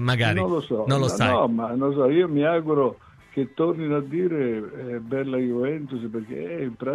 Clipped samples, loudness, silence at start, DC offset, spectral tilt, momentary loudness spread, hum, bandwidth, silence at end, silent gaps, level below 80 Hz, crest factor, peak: under 0.1%; -24 LUFS; 0 s; under 0.1%; -6.5 dB/octave; 11 LU; none; 12.5 kHz; 0 s; none; -58 dBFS; 16 dB; -8 dBFS